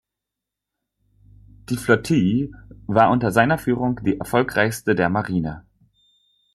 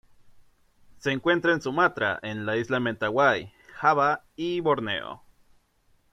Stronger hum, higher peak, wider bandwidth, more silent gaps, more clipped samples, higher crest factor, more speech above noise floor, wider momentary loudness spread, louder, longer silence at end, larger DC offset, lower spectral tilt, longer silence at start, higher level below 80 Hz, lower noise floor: neither; first, -2 dBFS vs -6 dBFS; first, 13.5 kHz vs 11 kHz; neither; neither; about the same, 20 dB vs 20 dB; first, 65 dB vs 40 dB; about the same, 12 LU vs 10 LU; first, -20 LUFS vs -25 LUFS; about the same, 0.95 s vs 0.95 s; neither; about the same, -6.5 dB/octave vs -5.5 dB/octave; first, 1.7 s vs 0.25 s; first, -48 dBFS vs -62 dBFS; first, -85 dBFS vs -65 dBFS